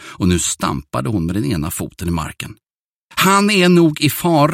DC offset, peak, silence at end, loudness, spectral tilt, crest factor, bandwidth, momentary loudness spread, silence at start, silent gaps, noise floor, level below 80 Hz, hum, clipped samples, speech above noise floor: under 0.1%; 0 dBFS; 0 s; -16 LUFS; -4.5 dB/octave; 16 dB; 16.5 kHz; 12 LU; 0 s; 2.73-3.09 s; -53 dBFS; -38 dBFS; none; under 0.1%; 37 dB